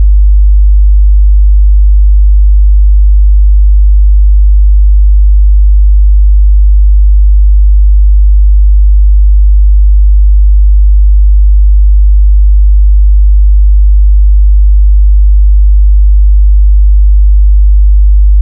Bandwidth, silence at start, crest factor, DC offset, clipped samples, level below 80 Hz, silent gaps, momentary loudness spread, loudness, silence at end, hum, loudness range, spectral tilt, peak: 0.1 kHz; 0 s; 4 dB; under 0.1%; under 0.1%; -4 dBFS; none; 0 LU; -8 LUFS; 0 s; none; 0 LU; -26.5 dB/octave; 0 dBFS